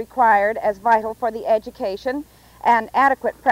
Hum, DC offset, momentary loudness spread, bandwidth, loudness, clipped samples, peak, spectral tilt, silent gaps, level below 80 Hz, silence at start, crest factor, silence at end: none; under 0.1%; 11 LU; 16 kHz; -19 LUFS; under 0.1%; -6 dBFS; -5 dB/octave; none; -54 dBFS; 0 s; 14 dB; 0 s